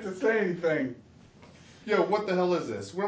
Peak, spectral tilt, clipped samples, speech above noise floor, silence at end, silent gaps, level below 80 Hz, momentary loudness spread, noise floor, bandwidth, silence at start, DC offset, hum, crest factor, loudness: -12 dBFS; -6 dB/octave; under 0.1%; 26 dB; 0 s; none; -66 dBFS; 10 LU; -53 dBFS; 8 kHz; 0 s; under 0.1%; none; 18 dB; -28 LUFS